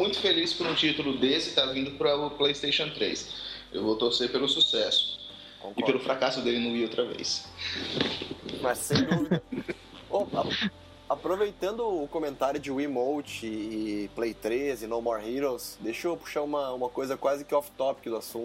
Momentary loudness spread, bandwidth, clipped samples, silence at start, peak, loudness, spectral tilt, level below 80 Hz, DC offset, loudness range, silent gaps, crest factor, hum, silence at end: 10 LU; 16 kHz; under 0.1%; 0 s; -8 dBFS; -29 LUFS; -4 dB/octave; -58 dBFS; under 0.1%; 5 LU; none; 22 dB; none; 0 s